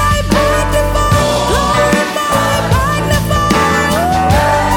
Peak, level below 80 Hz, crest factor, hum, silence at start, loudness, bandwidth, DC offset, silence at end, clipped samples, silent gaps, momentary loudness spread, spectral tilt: 0 dBFS; -22 dBFS; 12 dB; none; 0 s; -12 LUFS; 19 kHz; under 0.1%; 0 s; under 0.1%; none; 2 LU; -4.5 dB/octave